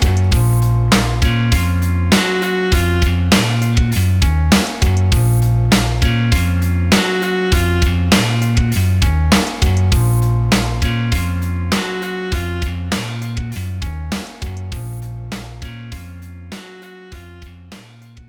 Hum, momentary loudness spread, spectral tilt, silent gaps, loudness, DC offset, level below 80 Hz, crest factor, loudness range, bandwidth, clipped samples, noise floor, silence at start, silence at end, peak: none; 14 LU; -5.5 dB/octave; none; -16 LUFS; under 0.1%; -22 dBFS; 14 dB; 13 LU; over 20 kHz; under 0.1%; -41 dBFS; 0 s; 0.1 s; -2 dBFS